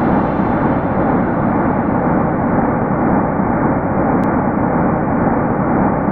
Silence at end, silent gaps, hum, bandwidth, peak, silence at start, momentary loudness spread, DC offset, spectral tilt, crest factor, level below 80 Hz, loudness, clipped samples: 0 s; none; none; 4.3 kHz; -2 dBFS; 0 s; 1 LU; under 0.1%; -11.5 dB/octave; 12 dB; -32 dBFS; -15 LUFS; under 0.1%